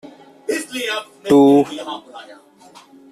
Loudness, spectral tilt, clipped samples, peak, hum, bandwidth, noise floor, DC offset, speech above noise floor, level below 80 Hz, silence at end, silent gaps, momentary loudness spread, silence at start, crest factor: -16 LUFS; -5 dB/octave; under 0.1%; -2 dBFS; none; 14 kHz; -45 dBFS; under 0.1%; 29 dB; -60 dBFS; 0.8 s; none; 21 LU; 0.5 s; 16 dB